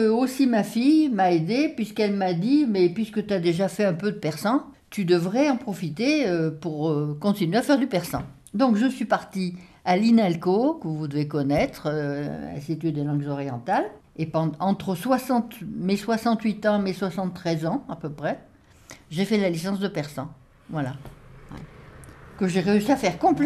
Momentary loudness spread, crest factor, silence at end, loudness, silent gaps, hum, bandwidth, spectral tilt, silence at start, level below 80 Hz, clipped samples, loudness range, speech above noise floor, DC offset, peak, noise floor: 11 LU; 16 dB; 0 s; -24 LUFS; none; none; 14 kHz; -6.5 dB/octave; 0 s; -56 dBFS; under 0.1%; 6 LU; 25 dB; under 0.1%; -8 dBFS; -49 dBFS